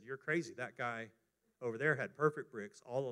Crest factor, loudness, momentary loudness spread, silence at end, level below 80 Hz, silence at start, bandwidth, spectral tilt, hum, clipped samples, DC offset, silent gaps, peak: 22 dB; -39 LUFS; 12 LU; 0 s; -88 dBFS; 0 s; 11.5 kHz; -6 dB/octave; none; under 0.1%; under 0.1%; none; -18 dBFS